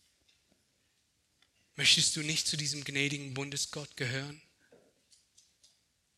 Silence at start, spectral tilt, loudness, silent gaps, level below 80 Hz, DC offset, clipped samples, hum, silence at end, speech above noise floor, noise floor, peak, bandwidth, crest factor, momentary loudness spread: 1.75 s; -1.5 dB/octave; -30 LUFS; none; -72 dBFS; under 0.1%; under 0.1%; none; 1.8 s; 42 dB; -75 dBFS; -12 dBFS; 15 kHz; 24 dB; 14 LU